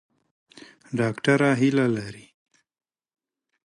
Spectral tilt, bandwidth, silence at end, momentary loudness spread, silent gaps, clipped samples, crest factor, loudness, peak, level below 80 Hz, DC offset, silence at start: -6.5 dB/octave; 11.5 kHz; 1.45 s; 12 LU; none; under 0.1%; 22 dB; -23 LUFS; -6 dBFS; -66 dBFS; under 0.1%; 0.9 s